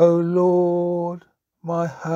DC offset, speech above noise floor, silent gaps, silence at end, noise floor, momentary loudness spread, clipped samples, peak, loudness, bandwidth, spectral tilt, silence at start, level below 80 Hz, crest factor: under 0.1%; 27 dB; none; 0 s; -46 dBFS; 15 LU; under 0.1%; -4 dBFS; -21 LUFS; 7.4 kHz; -9 dB/octave; 0 s; -70 dBFS; 16 dB